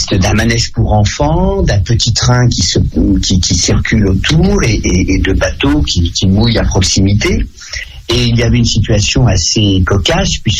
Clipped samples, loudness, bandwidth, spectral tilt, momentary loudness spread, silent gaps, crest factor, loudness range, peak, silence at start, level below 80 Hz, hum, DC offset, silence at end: under 0.1%; -11 LUFS; 12 kHz; -4.5 dB/octave; 3 LU; none; 10 dB; 1 LU; 0 dBFS; 0 s; -18 dBFS; none; under 0.1%; 0 s